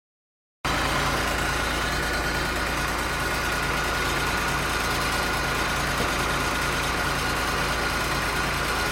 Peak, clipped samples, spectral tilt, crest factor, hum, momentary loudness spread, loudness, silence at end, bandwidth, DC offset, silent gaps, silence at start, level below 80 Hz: -10 dBFS; under 0.1%; -3 dB/octave; 14 dB; none; 1 LU; -24 LUFS; 0 s; 16.5 kHz; under 0.1%; none; 0.65 s; -36 dBFS